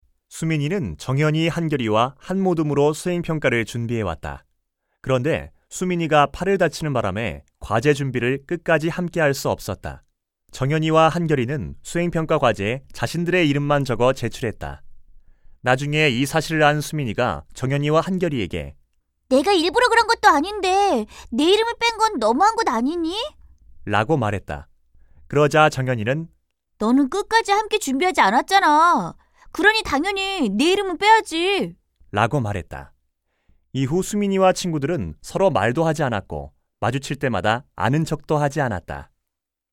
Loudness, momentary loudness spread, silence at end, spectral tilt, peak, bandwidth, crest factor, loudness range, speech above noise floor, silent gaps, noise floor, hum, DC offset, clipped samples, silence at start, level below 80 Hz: -20 LUFS; 12 LU; 0.7 s; -5.5 dB/octave; 0 dBFS; 16.5 kHz; 20 dB; 5 LU; 63 dB; none; -83 dBFS; none; under 0.1%; under 0.1%; 0.3 s; -46 dBFS